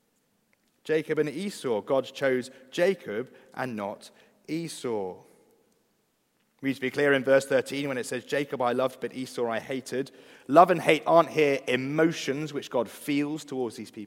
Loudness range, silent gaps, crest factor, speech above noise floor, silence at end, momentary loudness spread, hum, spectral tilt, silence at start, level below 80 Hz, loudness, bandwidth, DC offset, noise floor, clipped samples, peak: 11 LU; none; 24 dB; 45 dB; 0 s; 14 LU; none; -5 dB/octave; 0.85 s; -78 dBFS; -27 LUFS; 16 kHz; under 0.1%; -72 dBFS; under 0.1%; -4 dBFS